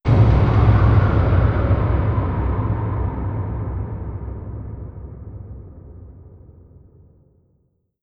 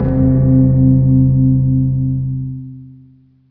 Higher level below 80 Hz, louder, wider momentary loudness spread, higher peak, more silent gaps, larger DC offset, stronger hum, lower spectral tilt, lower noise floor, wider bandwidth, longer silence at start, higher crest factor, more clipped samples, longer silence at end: about the same, -26 dBFS vs -28 dBFS; second, -19 LUFS vs -13 LUFS; first, 22 LU vs 14 LU; about the same, -2 dBFS vs -2 dBFS; neither; neither; neither; second, -10 dB/octave vs -15.5 dB/octave; first, -65 dBFS vs -46 dBFS; first, 5 kHz vs 1.9 kHz; about the same, 0.05 s vs 0 s; about the same, 16 dB vs 12 dB; neither; first, 1.65 s vs 0.6 s